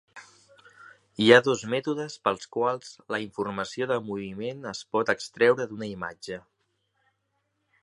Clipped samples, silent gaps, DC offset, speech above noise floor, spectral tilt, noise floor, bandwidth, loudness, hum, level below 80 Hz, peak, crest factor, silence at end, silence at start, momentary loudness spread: under 0.1%; none; under 0.1%; 50 dB; -4.5 dB/octave; -76 dBFS; 11 kHz; -26 LUFS; none; -68 dBFS; -2 dBFS; 26 dB; 1.45 s; 0.15 s; 17 LU